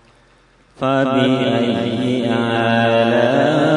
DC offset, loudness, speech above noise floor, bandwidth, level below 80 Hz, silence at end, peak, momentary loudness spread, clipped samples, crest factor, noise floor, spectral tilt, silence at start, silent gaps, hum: under 0.1%; -16 LUFS; 37 dB; 10.5 kHz; -56 dBFS; 0 s; -2 dBFS; 5 LU; under 0.1%; 14 dB; -52 dBFS; -6.5 dB/octave; 0.8 s; none; none